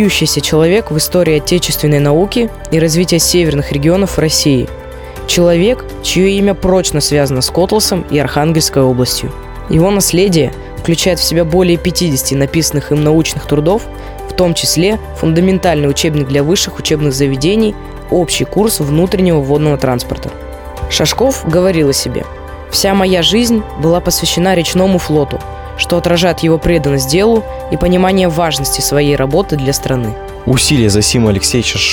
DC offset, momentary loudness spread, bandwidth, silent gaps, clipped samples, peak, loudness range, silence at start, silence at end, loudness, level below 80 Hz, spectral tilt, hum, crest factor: under 0.1%; 7 LU; 19.5 kHz; none; under 0.1%; 0 dBFS; 2 LU; 0 s; 0 s; -12 LUFS; -28 dBFS; -4.5 dB/octave; none; 12 dB